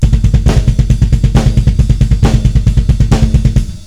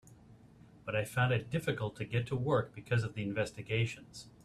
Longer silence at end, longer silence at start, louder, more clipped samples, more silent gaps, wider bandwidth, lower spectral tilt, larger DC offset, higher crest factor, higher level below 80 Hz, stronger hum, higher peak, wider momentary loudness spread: second, 0 s vs 0.15 s; about the same, 0 s vs 0.05 s; first, -11 LUFS vs -35 LUFS; first, 4% vs under 0.1%; neither; second, 11 kHz vs 13.5 kHz; first, -7.5 dB/octave vs -6 dB/octave; first, 2% vs under 0.1%; second, 8 dB vs 18 dB; first, -12 dBFS vs -62 dBFS; neither; first, 0 dBFS vs -18 dBFS; second, 2 LU vs 6 LU